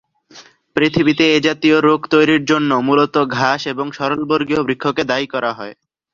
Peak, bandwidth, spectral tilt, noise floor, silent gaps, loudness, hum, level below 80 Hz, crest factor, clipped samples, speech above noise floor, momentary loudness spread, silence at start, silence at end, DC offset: 0 dBFS; 7.4 kHz; -5.5 dB/octave; -44 dBFS; none; -16 LUFS; none; -54 dBFS; 16 dB; under 0.1%; 29 dB; 8 LU; 0.35 s; 0.4 s; under 0.1%